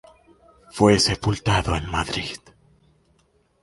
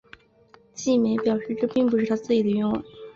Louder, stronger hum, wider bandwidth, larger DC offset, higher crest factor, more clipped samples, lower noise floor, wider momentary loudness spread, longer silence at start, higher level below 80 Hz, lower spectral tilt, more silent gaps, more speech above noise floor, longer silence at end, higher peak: first, -21 LUFS vs -24 LUFS; neither; first, 11.5 kHz vs 7.4 kHz; neither; first, 20 dB vs 14 dB; neither; first, -63 dBFS vs -56 dBFS; first, 17 LU vs 8 LU; about the same, 0.75 s vs 0.75 s; first, -40 dBFS vs -60 dBFS; second, -4.5 dB/octave vs -6 dB/octave; neither; first, 42 dB vs 33 dB; first, 1.25 s vs 0.05 s; first, -4 dBFS vs -10 dBFS